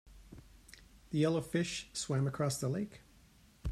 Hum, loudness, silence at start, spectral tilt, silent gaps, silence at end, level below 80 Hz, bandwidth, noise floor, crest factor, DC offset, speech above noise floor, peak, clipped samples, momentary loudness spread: none; -36 LUFS; 0.05 s; -5.5 dB/octave; none; 0 s; -54 dBFS; 14.5 kHz; -63 dBFS; 18 dB; under 0.1%; 28 dB; -20 dBFS; under 0.1%; 24 LU